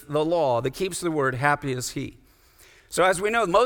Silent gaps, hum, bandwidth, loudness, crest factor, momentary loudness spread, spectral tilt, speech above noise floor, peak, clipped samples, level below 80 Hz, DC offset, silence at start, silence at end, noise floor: none; none; 19 kHz; -24 LUFS; 20 dB; 10 LU; -4.5 dB/octave; 31 dB; -4 dBFS; under 0.1%; -52 dBFS; under 0.1%; 0 s; 0 s; -55 dBFS